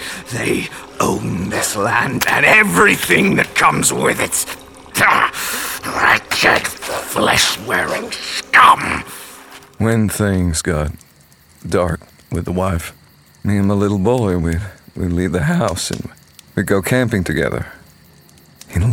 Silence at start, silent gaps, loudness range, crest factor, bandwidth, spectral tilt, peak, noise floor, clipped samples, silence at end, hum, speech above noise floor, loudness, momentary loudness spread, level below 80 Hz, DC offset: 0 s; none; 7 LU; 16 dB; 19 kHz; -4 dB/octave; 0 dBFS; -48 dBFS; under 0.1%; 0 s; none; 32 dB; -15 LUFS; 14 LU; -38 dBFS; under 0.1%